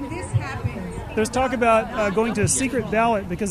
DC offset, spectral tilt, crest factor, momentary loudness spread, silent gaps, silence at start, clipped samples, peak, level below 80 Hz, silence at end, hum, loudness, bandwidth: under 0.1%; -5 dB/octave; 16 dB; 10 LU; none; 0 s; under 0.1%; -6 dBFS; -40 dBFS; 0 s; none; -22 LUFS; 14 kHz